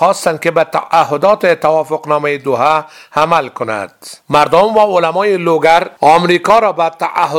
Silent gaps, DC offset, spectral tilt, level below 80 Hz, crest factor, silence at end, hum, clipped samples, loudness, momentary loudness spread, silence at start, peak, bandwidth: none; under 0.1%; -5 dB/octave; -52 dBFS; 12 dB; 0 s; none; 0.3%; -12 LUFS; 6 LU; 0 s; 0 dBFS; 17 kHz